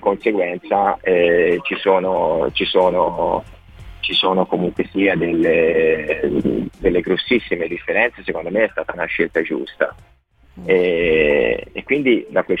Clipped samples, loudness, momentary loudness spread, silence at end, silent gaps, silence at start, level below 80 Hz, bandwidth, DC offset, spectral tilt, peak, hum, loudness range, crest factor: under 0.1%; -18 LUFS; 8 LU; 0 s; none; 0 s; -44 dBFS; 5 kHz; under 0.1%; -7 dB/octave; -2 dBFS; none; 3 LU; 16 dB